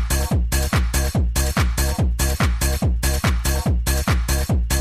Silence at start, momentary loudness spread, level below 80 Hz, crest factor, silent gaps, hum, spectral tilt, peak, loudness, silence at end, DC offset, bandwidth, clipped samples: 0 s; 1 LU; -22 dBFS; 14 dB; none; none; -4.5 dB/octave; -6 dBFS; -21 LUFS; 0 s; under 0.1%; 16 kHz; under 0.1%